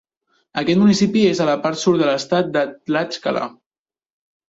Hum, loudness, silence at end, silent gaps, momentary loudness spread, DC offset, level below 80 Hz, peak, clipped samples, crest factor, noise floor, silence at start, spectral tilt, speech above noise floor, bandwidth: none; -18 LUFS; 1 s; none; 9 LU; under 0.1%; -60 dBFS; -4 dBFS; under 0.1%; 14 dB; under -90 dBFS; 0.55 s; -5.5 dB/octave; over 73 dB; 8 kHz